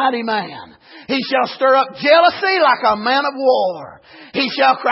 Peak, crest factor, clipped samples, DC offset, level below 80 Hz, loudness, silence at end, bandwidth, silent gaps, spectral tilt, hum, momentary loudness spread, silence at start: -2 dBFS; 14 dB; under 0.1%; under 0.1%; -62 dBFS; -15 LUFS; 0 s; 5.8 kHz; none; -7 dB/octave; none; 11 LU; 0 s